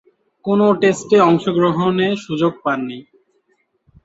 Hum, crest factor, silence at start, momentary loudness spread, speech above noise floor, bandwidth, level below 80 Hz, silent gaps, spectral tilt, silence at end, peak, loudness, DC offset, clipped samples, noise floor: none; 16 dB; 0.45 s; 11 LU; 49 dB; 8 kHz; -58 dBFS; none; -6.5 dB/octave; 1.05 s; -2 dBFS; -16 LUFS; under 0.1%; under 0.1%; -64 dBFS